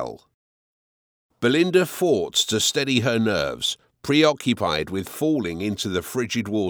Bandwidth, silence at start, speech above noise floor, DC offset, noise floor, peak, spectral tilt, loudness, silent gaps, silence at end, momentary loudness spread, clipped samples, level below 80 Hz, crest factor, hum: over 20 kHz; 0 s; over 68 dB; under 0.1%; under -90 dBFS; -4 dBFS; -4 dB/octave; -22 LUFS; 0.34-1.29 s; 0 s; 7 LU; under 0.1%; -54 dBFS; 18 dB; none